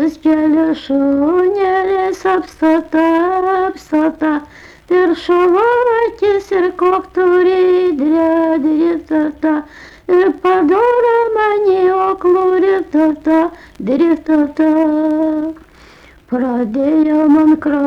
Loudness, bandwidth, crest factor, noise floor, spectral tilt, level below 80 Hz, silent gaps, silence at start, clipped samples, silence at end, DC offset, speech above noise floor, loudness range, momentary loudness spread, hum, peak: -13 LUFS; 7.2 kHz; 8 dB; -42 dBFS; -6.5 dB/octave; -48 dBFS; none; 0 s; under 0.1%; 0 s; under 0.1%; 29 dB; 2 LU; 6 LU; none; -4 dBFS